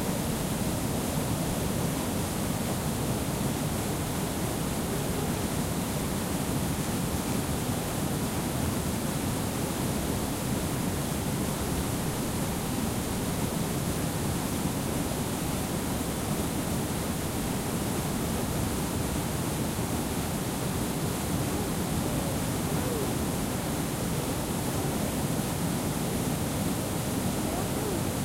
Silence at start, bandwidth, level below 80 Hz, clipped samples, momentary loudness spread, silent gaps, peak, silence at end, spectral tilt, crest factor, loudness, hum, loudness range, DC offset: 0 s; 16 kHz; -42 dBFS; under 0.1%; 1 LU; none; -16 dBFS; 0 s; -5 dB/octave; 14 dB; -30 LUFS; none; 0 LU; under 0.1%